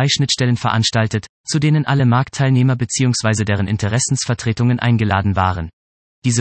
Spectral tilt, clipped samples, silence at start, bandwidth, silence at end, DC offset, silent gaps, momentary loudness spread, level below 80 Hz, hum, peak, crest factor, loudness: -5 dB/octave; under 0.1%; 0 s; 8.8 kHz; 0 s; under 0.1%; 1.29-1.44 s, 5.73-6.22 s; 5 LU; -48 dBFS; none; -2 dBFS; 14 dB; -17 LUFS